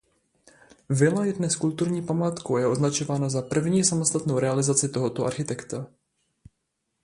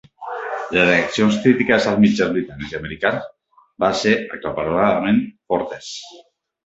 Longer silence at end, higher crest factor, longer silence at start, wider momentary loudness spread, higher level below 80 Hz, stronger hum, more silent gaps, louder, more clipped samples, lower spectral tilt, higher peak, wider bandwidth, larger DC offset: first, 1.15 s vs 0.45 s; about the same, 20 dB vs 18 dB; first, 0.9 s vs 0.2 s; second, 9 LU vs 14 LU; second, -60 dBFS vs -50 dBFS; neither; neither; second, -25 LUFS vs -19 LUFS; neither; about the same, -5 dB/octave vs -5.5 dB/octave; second, -6 dBFS vs -2 dBFS; first, 11.5 kHz vs 8 kHz; neither